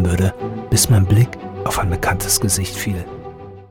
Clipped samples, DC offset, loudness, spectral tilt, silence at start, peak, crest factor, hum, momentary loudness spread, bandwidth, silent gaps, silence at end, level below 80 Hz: under 0.1%; under 0.1%; -18 LUFS; -4.5 dB/octave; 0 s; -4 dBFS; 14 dB; none; 17 LU; 19 kHz; none; 0.05 s; -34 dBFS